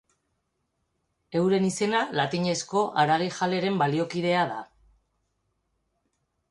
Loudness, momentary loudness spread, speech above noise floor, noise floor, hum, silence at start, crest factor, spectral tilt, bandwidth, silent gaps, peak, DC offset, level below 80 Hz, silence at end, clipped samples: -25 LUFS; 4 LU; 52 dB; -77 dBFS; none; 1.3 s; 18 dB; -5 dB/octave; 11.5 kHz; none; -10 dBFS; under 0.1%; -68 dBFS; 1.85 s; under 0.1%